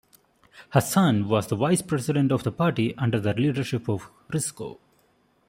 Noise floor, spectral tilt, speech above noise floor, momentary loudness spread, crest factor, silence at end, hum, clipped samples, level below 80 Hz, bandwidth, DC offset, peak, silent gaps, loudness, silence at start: -64 dBFS; -6 dB/octave; 40 dB; 10 LU; 22 dB; 0.75 s; none; under 0.1%; -60 dBFS; 16 kHz; under 0.1%; -4 dBFS; none; -25 LUFS; 0.55 s